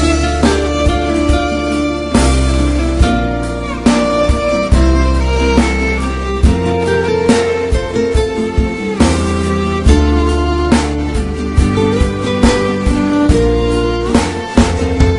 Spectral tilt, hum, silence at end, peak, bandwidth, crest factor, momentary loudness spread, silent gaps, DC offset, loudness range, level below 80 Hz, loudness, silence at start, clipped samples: -6 dB/octave; none; 0 s; 0 dBFS; 11 kHz; 12 dB; 4 LU; none; under 0.1%; 1 LU; -18 dBFS; -13 LUFS; 0 s; under 0.1%